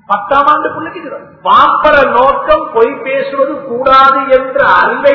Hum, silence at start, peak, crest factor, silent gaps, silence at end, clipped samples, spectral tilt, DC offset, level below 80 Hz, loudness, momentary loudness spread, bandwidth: none; 0.1 s; 0 dBFS; 10 dB; none; 0 s; 1%; -5.5 dB/octave; under 0.1%; -40 dBFS; -9 LUFS; 12 LU; 6 kHz